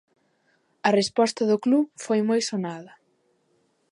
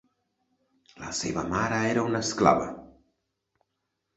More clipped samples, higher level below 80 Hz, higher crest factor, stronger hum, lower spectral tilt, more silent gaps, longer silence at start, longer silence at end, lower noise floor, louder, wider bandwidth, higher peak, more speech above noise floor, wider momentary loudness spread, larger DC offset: neither; second, -76 dBFS vs -56 dBFS; second, 20 dB vs 26 dB; neither; about the same, -4.5 dB/octave vs -4.5 dB/octave; neither; about the same, 0.85 s vs 0.95 s; second, 1.05 s vs 1.3 s; second, -68 dBFS vs -81 dBFS; about the same, -24 LUFS vs -26 LUFS; first, 11.5 kHz vs 8.2 kHz; about the same, -6 dBFS vs -4 dBFS; second, 45 dB vs 55 dB; second, 9 LU vs 15 LU; neither